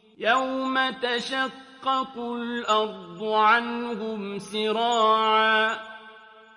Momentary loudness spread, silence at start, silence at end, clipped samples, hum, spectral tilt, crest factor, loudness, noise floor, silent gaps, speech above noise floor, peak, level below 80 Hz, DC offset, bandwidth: 12 LU; 0.2 s; 0.35 s; under 0.1%; none; -3 dB/octave; 18 dB; -24 LUFS; -49 dBFS; none; 24 dB; -8 dBFS; -72 dBFS; under 0.1%; 11 kHz